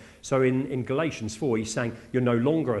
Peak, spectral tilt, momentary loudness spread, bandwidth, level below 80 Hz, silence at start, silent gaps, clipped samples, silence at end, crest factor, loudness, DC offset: -10 dBFS; -6 dB/octave; 6 LU; 12 kHz; -58 dBFS; 0 s; none; under 0.1%; 0 s; 16 dB; -26 LUFS; under 0.1%